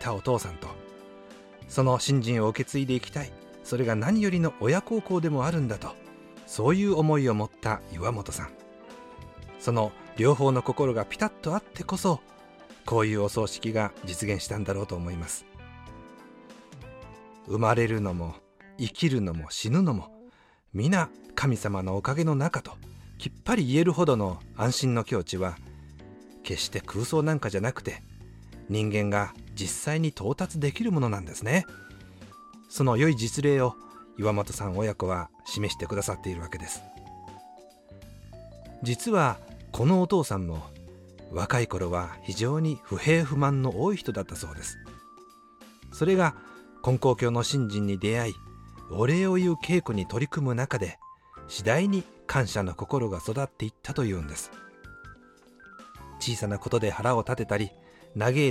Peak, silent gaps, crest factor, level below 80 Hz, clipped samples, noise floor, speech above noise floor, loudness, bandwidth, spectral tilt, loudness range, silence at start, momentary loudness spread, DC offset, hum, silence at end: -8 dBFS; none; 20 dB; -52 dBFS; under 0.1%; -56 dBFS; 30 dB; -28 LUFS; 15.5 kHz; -6 dB/octave; 5 LU; 0 s; 23 LU; under 0.1%; none; 0 s